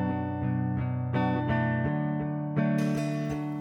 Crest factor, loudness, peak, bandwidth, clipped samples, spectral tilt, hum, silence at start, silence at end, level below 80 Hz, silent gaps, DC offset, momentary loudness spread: 14 dB; -29 LUFS; -14 dBFS; 11.5 kHz; under 0.1%; -8.5 dB/octave; none; 0 s; 0 s; -52 dBFS; none; under 0.1%; 4 LU